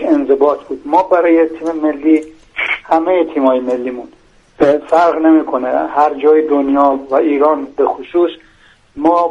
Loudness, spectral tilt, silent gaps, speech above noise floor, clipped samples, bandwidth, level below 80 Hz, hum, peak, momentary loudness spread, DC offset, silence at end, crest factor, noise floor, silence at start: -13 LUFS; -6 dB/octave; none; 35 dB; under 0.1%; 7.4 kHz; -50 dBFS; none; 0 dBFS; 7 LU; under 0.1%; 0 s; 14 dB; -47 dBFS; 0 s